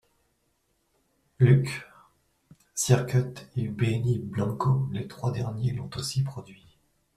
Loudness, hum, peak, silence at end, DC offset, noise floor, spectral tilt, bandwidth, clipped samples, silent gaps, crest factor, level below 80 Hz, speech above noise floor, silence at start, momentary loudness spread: -27 LUFS; none; -6 dBFS; 0.65 s; under 0.1%; -72 dBFS; -6 dB/octave; 13.5 kHz; under 0.1%; none; 22 dB; -56 dBFS; 46 dB; 1.4 s; 12 LU